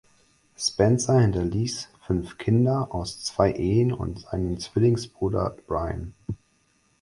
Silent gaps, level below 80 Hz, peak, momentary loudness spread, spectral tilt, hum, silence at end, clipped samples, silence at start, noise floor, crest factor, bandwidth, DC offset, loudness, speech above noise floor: none; -42 dBFS; -4 dBFS; 11 LU; -6 dB/octave; none; 0.65 s; under 0.1%; 0.6 s; -66 dBFS; 20 dB; 11.5 kHz; under 0.1%; -25 LUFS; 42 dB